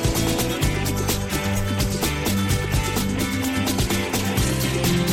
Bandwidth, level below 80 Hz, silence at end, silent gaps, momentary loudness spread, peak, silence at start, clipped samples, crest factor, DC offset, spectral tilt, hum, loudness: 17 kHz; -32 dBFS; 0 s; none; 2 LU; -8 dBFS; 0 s; under 0.1%; 14 dB; under 0.1%; -4.5 dB/octave; none; -22 LUFS